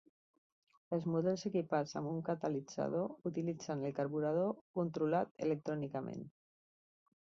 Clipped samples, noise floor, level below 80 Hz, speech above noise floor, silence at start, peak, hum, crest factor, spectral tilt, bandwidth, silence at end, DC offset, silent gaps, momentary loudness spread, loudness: under 0.1%; under -90 dBFS; -78 dBFS; over 52 dB; 0.9 s; -20 dBFS; none; 18 dB; -7 dB/octave; 7.6 kHz; 0.95 s; under 0.1%; 4.61-4.74 s, 5.31-5.35 s; 6 LU; -38 LUFS